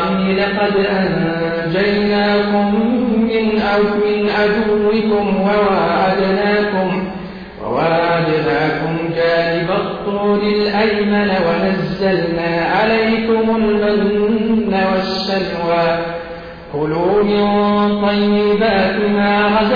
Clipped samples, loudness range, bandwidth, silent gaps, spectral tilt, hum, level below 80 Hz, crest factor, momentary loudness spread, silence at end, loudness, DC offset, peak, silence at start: under 0.1%; 2 LU; 5.2 kHz; none; -8 dB/octave; none; -42 dBFS; 10 dB; 5 LU; 0 s; -15 LUFS; under 0.1%; -4 dBFS; 0 s